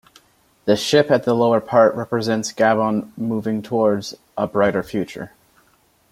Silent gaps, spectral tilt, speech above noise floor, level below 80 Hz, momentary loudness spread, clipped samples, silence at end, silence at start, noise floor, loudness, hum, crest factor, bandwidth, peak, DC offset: none; -5.5 dB/octave; 40 dB; -58 dBFS; 11 LU; under 0.1%; 0.85 s; 0.65 s; -59 dBFS; -19 LUFS; none; 18 dB; 16 kHz; -2 dBFS; under 0.1%